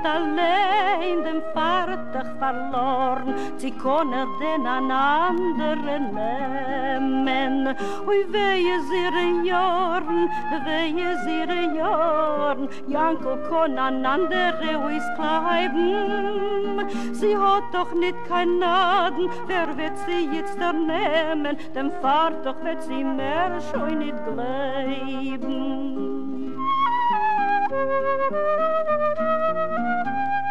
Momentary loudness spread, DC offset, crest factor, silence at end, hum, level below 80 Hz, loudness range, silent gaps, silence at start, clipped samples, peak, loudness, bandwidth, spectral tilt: 7 LU; 3%; 14 dB; 0 s; none; -62 dBFS; 3 LU; none; 0 s; under 0.1%; -10 dBFS; -23 LUFS; 11.5 kHz; -5 dB/octave